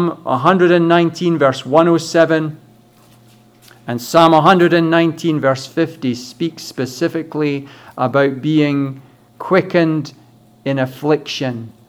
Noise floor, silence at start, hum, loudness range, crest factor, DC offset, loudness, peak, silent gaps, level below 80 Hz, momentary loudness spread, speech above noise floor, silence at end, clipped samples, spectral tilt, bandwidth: -47 dBFS; 0 s; none; 5 LU; 16 dB; under 0.1%; -15 LUFS; 0 dBFS; none; -62 dBFS; 13 LU; 33 dB; 0.15 s; under 0.1%; -6 dB/octave; 15.5 kHz